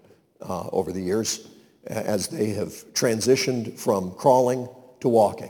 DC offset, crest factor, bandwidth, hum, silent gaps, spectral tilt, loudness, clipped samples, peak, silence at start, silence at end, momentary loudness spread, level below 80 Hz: under 0.1%; 20 dB; 19 kHz; none; none; -4.5 dB/octave; -24 LUFS; under 0.1%; -6 dBFS; 0.4 s; 0 s; 12 LU; -62 dBFS